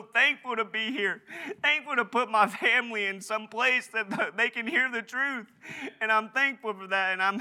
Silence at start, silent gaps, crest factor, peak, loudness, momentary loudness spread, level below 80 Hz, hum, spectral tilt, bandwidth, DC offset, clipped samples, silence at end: 0 s; none; 20 dB; -8 dBFS; -27 LUFS; 10 LU; under -90 dBFS; none; -3 dB/octave; 16.5 kHz; under 0.1%; under 0.1%; 0 s